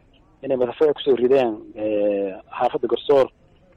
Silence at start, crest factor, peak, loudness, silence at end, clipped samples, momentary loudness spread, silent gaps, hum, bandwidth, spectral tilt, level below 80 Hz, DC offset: 0.45 s; 12 dB; -8 dBFS; -21 LUFS; 0.5 s; under 0.1%; 9 LU; none; none; 6.8 kHz; -7 dB/octave; -58 dBFS; under 0.1%